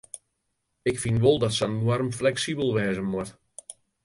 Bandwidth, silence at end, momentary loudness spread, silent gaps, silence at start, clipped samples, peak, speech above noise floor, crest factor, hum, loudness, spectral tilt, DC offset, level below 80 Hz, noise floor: 11.5 kHz; 0.35 s; 22 LU; none; 0.15 s; under 0.1%; -8 dBFS; 53 dB; 18 dB; none; -25 LUFS; -5.5 dB/octave; under 0.1%; -54 dBFS; -77 dBFS